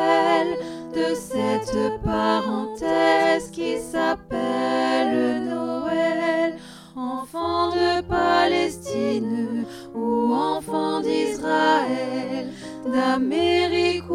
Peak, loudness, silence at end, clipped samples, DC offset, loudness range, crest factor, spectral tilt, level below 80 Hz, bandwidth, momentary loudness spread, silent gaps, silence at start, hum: -8 dBFS; -23 LUFS; 0 s; under 0.1%; under 0.1%; 2 LU; 14 dB; -5 dB/octave; -48 dBFS; 15 kHz; 10 LU; none; 0 s; none